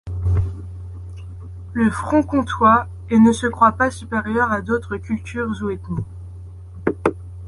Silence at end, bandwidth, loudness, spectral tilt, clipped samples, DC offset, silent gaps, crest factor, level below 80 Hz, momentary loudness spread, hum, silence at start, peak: 0 s; 11.5 kHz; -19 LUFS; -7 dB/octave; under 0.1%; under 0.1%; none; 18 dB; -34 dBFS; 20 LU; none; 0.05 s; -2 dBFS